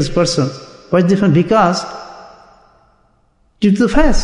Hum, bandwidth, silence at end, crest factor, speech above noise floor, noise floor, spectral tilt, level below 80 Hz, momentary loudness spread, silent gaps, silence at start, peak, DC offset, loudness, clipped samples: none; 11 kHz; 0 s; 14 dB; 44 dB; -56 dBFS; -6 dB/octave; -26 dBFS; 18 LU; none; 0 s; -2 dBFS; under 0.1%; -14 LUFS; under 0.1%